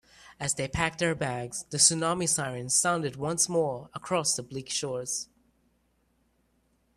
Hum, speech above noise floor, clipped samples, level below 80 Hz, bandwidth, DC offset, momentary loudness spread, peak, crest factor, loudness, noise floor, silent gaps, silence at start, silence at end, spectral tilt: none; 42 dB; under 0.1%; -56 dBFS; 14.5 kHz; under 0.1%; 12 LU; -6 dBFS; 24 dB; -27 LUFS; -71 dBFS; none; 0.2 s; 1.7 s; -2.5 dB/octave